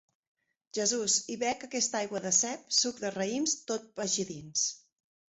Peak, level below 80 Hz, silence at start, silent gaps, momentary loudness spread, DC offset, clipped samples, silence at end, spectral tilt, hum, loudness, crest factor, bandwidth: -12 dBFS; -74 dBFS; 0.75 s; none; 7 LU; under 0.1%; under 0.1%; 0.6 s; -1.5 dB/octave; none; -30 LUFS; 20 dB; 8.4 kHz